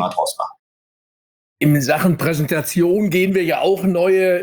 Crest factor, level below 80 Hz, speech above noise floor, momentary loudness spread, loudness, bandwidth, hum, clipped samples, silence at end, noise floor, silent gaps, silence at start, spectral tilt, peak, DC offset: 14 dB; -56 dBFS; over 74 dB; 6 LU; -17 LUFS; over 20 kHz; none; under 0.1%; 0 s; under -90 dBFS; 0.59-1.56 s; 0 s; -6 dB/octave; -4 dBFS; under 0.1%